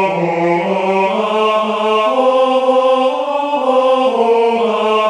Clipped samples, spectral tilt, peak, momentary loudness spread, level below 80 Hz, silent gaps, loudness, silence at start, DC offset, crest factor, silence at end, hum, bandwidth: under 0.1%; -5.5 dB/octave; 0 dBFS; 3 LU; -64 dBFS; none; -14 LUFS; 0 s; under 0.1%; 12 dB; 0 s; none; 10.5 kHz